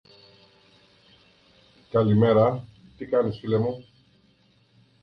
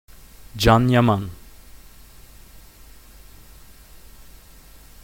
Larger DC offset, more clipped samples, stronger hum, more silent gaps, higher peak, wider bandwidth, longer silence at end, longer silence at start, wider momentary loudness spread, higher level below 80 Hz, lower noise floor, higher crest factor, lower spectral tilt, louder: neither; neither; neither; neither; second, -8 dBFS vs 0 dBFS; second, 5.8 kHz vs 17 kHz; second, 1.2 s vs 3.3 s; first, 1.95 s vs 0.55 s; second, 17 LU vs 21 LU; second, -58 dBFS vs -40 dBFS; first, -62 dBFS vs -46 dBFS; second, 18 dB vs 24 dB; first, -10 dB/octave vs -6 dB/octave; second, -23 LUFS vs -18 LUFS